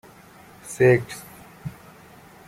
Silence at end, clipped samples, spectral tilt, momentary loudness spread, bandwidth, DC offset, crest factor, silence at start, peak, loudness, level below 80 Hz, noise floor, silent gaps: 0.75 s; under 0.1%; -6.5 dB/octave; 24 LU; 16 kHz; under 0.1%; 20 dB; 0.65 s; -4 dBFS; -20 LUFS; -58 dBFS; -48 dBFS; none